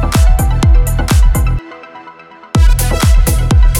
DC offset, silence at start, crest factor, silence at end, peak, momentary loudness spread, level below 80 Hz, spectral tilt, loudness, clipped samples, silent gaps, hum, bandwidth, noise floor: under 0.1%; 0 s; 10 dB; 0 s; 0 dBFS; 11 LU; -10 dBFS; -5.5 dB/octave; -12 LUFS; under 0.1%; none; none; 17 kHz; -36 dBFS